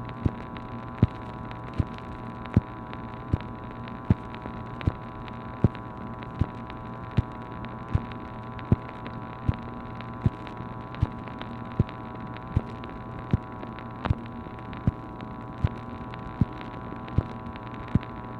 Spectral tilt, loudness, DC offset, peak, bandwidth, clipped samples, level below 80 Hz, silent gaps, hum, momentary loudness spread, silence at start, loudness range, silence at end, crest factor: -9.5 dB/octave; -32 LUFS; under 0.1%; -6 dBFS; 6 kHz; under 0.1%; -40 dBFS; none; none; 10 LU; 0 s; 1 LU; 0 s; 26 dB